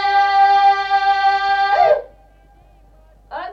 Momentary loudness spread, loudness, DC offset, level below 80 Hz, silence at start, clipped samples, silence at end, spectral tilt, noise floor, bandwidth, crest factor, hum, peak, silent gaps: 8 LU; -15 LUFS; under 0.1%; -50 dBFS; 0 s; under 0.1%; 0 s; -2.5 dB/octave; -49 dBFS; 7 kHz; 12 dB; none; -4 dBFS; none